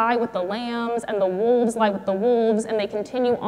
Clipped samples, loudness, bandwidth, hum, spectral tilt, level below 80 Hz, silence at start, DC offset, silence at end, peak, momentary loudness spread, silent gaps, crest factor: under 0.1%; -22 LUFS; 12 kHz; none; -5.5 dB/octave; -62 dBFS; 0 s; under 0.1%; 0 s; -6 dBFS; 6 LU; none; 16 dB